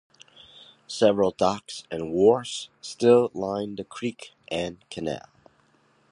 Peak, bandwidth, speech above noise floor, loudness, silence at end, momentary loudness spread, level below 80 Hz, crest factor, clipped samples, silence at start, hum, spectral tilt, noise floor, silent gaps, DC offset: -6 dBFS; 11 kHz; 39 dB; -25 LUFS; 0.9 s; 15 LU; -60 dBFS; 20 dB; under 0.1%; 0.9 s; none; -5 dB/octave; -63 dBFS; none; under 0.1%